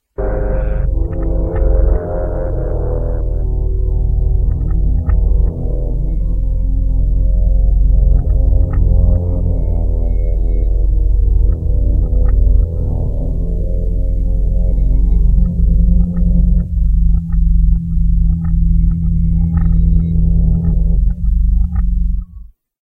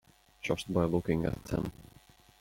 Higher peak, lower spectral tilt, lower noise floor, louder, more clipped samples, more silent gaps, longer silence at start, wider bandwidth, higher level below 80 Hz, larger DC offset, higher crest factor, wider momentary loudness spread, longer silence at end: first, 0 dBFS vs -14 dBFS; first, -12.5 dB/octave vs -7 dB/octave; second, -35 dBFS vs -60 dBFS; first, -17 LUFS vs -33 LUFS; neither; neither; second, 0.2 s vs 0.45 s; second, 1.9 kHz vs 16.5 kHz; first, -12 dBFS vs -52 dBFS; neither; second, 12 dB vs 20 dB; second, 6 LU vs 9 LU; second, 0.35 s vs 0.55 s